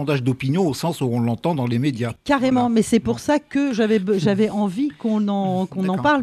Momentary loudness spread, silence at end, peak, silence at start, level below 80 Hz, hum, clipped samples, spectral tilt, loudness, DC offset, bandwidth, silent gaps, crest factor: 5 LU; 0 s; -6 dBFS; 0 s; -52 dBFS; none; under 0.1%; -6.5 dB/octave; -20 LUFS; under 0.1%; 14 kHz; none; 14 dB